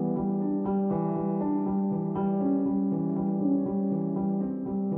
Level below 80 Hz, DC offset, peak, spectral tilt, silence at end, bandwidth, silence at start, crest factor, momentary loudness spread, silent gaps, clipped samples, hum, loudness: -58 dBFS; under 0.1%; -16 dBFS; -14 dB/octave; 0 s; 2.7 kHz; 0 s; 12 dB; 2 LU; none; under 0.1%; none; -28 LUFS